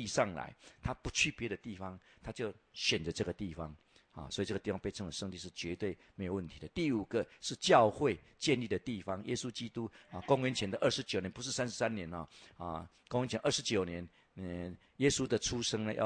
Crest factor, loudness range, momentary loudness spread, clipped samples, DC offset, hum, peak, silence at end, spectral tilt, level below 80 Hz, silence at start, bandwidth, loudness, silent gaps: 24 dB; 6 LU; 14 LU; under 0.1%; under 0.1%; none; -12 dBFS; 0 s; -4 dB/octave; -60 dBFS; 0 s; 10.5 kHz; -36 LUFS; none